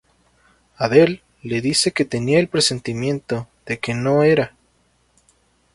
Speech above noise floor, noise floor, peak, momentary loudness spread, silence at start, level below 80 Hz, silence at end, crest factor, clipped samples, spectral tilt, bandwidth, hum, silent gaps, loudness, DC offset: 43 dB; -61 dBFS; 0 dBFS; 12 LU; 0.8 s; -54 dBFS; 1.25 s; 20 dB; under 0.1%; -4.5 dB/octave; 11.5 kHz; none; none; -19 LUFS; under 0.1%